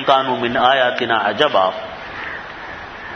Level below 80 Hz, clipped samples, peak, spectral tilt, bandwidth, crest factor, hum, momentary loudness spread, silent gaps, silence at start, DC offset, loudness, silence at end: -52 dBFS; under 0.1%; 0 dBFS; -4.5 dB/octave; 6.6 kHz; 18 dB; none; 16 LU; none; 0 s; under 0.1%; -17 LUFS; 0 s